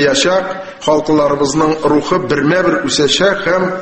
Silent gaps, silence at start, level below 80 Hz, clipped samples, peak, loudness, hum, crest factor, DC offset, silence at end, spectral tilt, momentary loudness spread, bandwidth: none; 0 s; -44 dBFS; under 0.1%; 0 dBFS; -13 LUFS; none; 12 dB; under 0.1%; 0 s; -4 dB/octave; 4 LU; 8.8 kHz